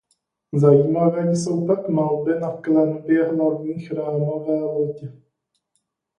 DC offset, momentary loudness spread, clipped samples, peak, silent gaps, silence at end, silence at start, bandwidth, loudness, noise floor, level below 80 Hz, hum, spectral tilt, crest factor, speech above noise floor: under 0.1%; 11 LU; under 0.1%; -2 dBFS; none; 1.05 s; 0.55 s; 10.5 kHz; -20 LUFS; -74 dBFS; -64 dBFS; none; -8 dB/octave; 18 dB; 54 dB